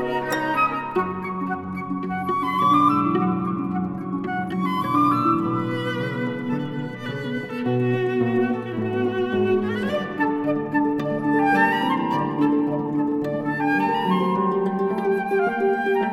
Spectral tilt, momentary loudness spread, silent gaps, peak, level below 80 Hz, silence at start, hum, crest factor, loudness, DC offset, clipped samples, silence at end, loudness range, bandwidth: -7.5 dB/octave; 8 LU; none; -6 dBFS; -60 dBFS; 0 s; none; 16 dB; -23 LUFS; under 0.1%; under 0.1%; 0 s; 3 LU; 15 kHz